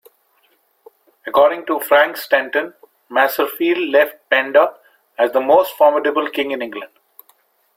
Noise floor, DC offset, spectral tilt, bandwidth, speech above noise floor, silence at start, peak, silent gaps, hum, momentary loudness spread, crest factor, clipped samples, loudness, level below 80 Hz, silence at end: -60 dBFS; under 0.1%; -3 dB/octave; 16.5 kHz; 44 dB; 1.25 s; -2 dBFS; none; none; 12 LU; 16 dB; under 0.1%; -16 LUFS; -66 dBFS; 0.9 s